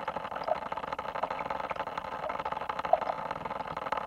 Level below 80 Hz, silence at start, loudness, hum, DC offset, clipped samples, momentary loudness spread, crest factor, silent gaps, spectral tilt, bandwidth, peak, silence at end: -60 dBFS; 0 s; -34 LUFS; none; under 0.1%; under 0.1%; 7 LU; 26 dB; none; -5 dB/octave; 15.5 kHz; -10 dBFS; 0 s